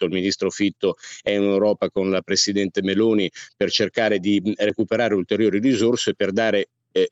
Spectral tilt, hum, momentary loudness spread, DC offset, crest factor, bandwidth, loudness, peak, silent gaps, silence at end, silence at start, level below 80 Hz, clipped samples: -4.5 dB/octave; none; 5 LU; under 0.1%; 14 dB; 8.2 kHz; -21 LUFS; -6 dBFS; none; 0.05 s; 0 s; -68 dBFS; under 0.1%